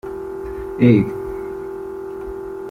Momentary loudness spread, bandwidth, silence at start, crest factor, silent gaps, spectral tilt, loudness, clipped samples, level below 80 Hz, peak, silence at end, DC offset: 16 LU; 14.5 kHz; 0.05 s; 18 dB; none; -9.5 dB/octave; -21 LUFS; under 0.1%; -42 dBFS; -2 dBFS; 0 s; under 0.1%